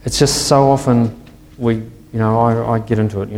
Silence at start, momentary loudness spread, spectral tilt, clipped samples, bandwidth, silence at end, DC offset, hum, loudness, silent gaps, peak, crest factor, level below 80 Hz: 0.05 s; 10 LU; -5.5 dB/octave; under 0.1%; 16.5 kHz; 0 s; under 0.1%; none; -15 LUFS; none; 0 dBFS; 16 dB; -38 dBFS